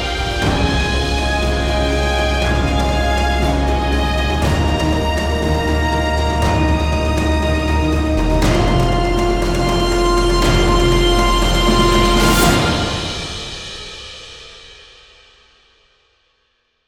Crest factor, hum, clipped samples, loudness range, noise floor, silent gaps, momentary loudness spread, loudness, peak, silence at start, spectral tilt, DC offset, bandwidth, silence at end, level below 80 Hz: 14 dB; none; under 0.1%; 6 LU; -64 dBFS; none; 9 LU; -16 LUFS; -2 dBFS; 0 s; -5 dB/octave; under 0.1%; 17.5 kHz; 2.15 s; -20 dBFS